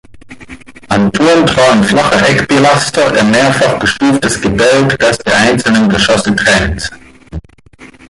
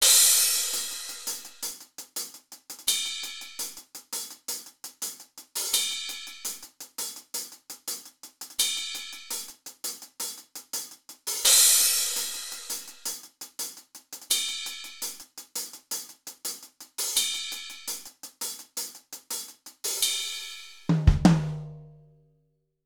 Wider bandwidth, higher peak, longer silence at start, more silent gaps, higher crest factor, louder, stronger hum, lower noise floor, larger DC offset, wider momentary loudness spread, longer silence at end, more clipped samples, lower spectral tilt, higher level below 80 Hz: second, 11.5 kHz vs over 20 kHz; first, 0 dBFS vs -4 dBFS; about the same, 0.1 s vs 0 s; neither; second, 10 dB vs 26 dB; first, -9 LUFS vs -27 LUFS; neither; second, -38 dBFS vs -71 dBFS; neither; second, 8 LU vs 19 LU; second, 0.25 s vs 0.9 s; neither; first, -4.5 dB/octave vs -2 dB/octave; first, -32 dBFS vs -42 dBFS